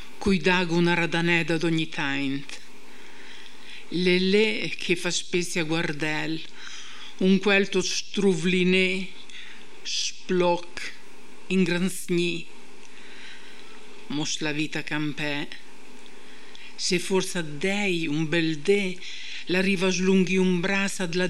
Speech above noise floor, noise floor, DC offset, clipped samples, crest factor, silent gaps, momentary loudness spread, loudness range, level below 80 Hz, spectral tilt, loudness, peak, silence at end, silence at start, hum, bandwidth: 25 dB; -50 dBFS; 3%; under 0.1%; 20 dB; none; 21 LU; 6 LU; -56 dBFS; -4.5 dB/octave; -25 LUFS; -8 dBFS; 0 s; 0 s; none; 13 kHz